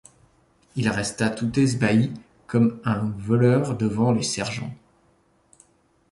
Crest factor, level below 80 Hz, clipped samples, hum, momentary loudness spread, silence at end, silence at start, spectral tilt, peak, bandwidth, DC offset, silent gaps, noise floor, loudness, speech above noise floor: 18 dB; -54 dBFS; under 0.1%; none; 10 LU; 1.4 s; 0.75 s; -6 dB/octave; -6 dBFS; 11.5 kHz; under 0.1%; none; -62 dBFS; -23 LUFS; 41 dB